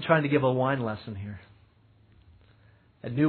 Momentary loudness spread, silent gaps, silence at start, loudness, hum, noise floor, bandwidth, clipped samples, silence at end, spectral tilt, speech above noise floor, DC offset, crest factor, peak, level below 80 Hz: 19 LU; none; 0 s; -27 LUFS; none; -60 dBFS; 4.5 kHz; under 0.1%; 0 s; -11 dB/octave; 34 dB; under 0.1%; 22 dB; -6 dBFS; -62 dBFS